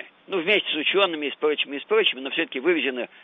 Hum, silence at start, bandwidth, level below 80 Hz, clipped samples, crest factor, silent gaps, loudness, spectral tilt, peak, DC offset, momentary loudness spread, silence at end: none; 0 s; 4.5 kHz; -80 dBFS; under 0.1%; 18 dB; none; -23 LUFS; -5.5 dB/octave; -8 dBFS; under 0.1%; 6 LU; 0.15 s